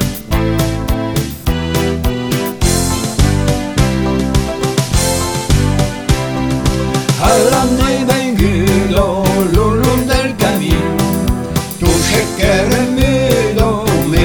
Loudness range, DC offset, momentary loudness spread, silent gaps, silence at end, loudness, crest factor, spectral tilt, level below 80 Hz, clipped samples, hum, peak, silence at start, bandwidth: 3 LU; under 0.1%; 5 LU; none; 0 s; -14 LUFS; 12 dB; -5 dB/octave; -22 dBFS; under 0.1%; none; 0 dBFS; 0 s; over 20 kHz